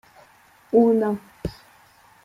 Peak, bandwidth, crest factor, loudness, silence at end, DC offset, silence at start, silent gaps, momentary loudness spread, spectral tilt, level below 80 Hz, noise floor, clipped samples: -6 dBFS; 14 kHz; 18 dB; -21 LUFS; 0.75 s; under 0.1%; 0.75 s; none; 17 LU; -8.5 dB/octave; -50 dBFS; -54 dBFS; under 0.1%